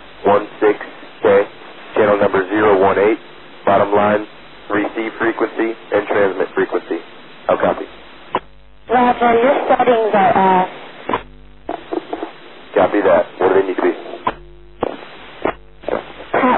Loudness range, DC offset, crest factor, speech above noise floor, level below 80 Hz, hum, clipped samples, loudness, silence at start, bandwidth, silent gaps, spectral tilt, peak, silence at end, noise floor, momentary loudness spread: 4 LU; 0.8%; 16 dB; 31 dB; -50 dBFS; none; under 0.1%; -17 LUFS; 0.2 s; 4.2 kHz; none; -10 dB/octave; -2 dBFS; 0 s; -44 dBFS; 15 LU